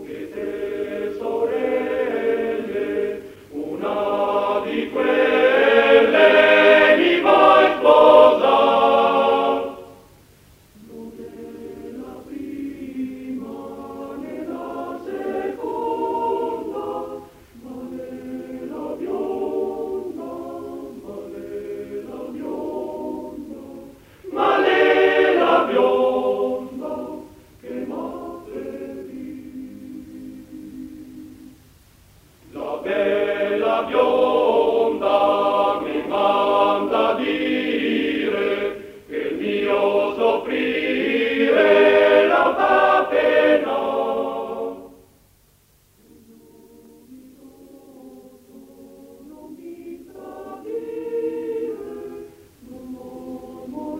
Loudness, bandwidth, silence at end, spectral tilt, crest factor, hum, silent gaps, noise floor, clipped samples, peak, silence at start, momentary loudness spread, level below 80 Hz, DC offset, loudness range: -19 LUFS; 16 kHz; 0 s; -5 dB/octave; 20 dB; none; none; -57 dBFS; under 0.1%; 0 dBFS; 0 s; 23 LU; -58 dBFS; under 0.1%; 19 LU